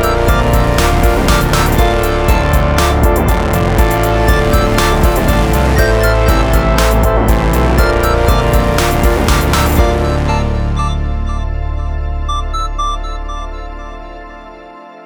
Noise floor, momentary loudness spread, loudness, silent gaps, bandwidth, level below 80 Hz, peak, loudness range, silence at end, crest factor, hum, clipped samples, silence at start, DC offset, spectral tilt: -33 dBFS; 12 LU; -13 LUFS; none; over 20 kHz; -14 dBFS; 0 dBFS; 8 LU; 0 s; 12 dB; none; under 0.1%; 0 s; under 0.1%; -5.5 dB/octave